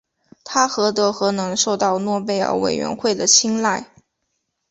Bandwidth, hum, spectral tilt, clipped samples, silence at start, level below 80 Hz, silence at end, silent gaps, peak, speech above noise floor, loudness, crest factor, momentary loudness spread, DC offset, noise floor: 8.2 kHz; none; -2.5 dB/octave; under 0.1%; 0.45 s; -60 dBFS; 0.85 s; none; 0 dBFS; 55 dB; -18 LUFS; 20 dB; 8 LU; under 0.1%; -74 dBFS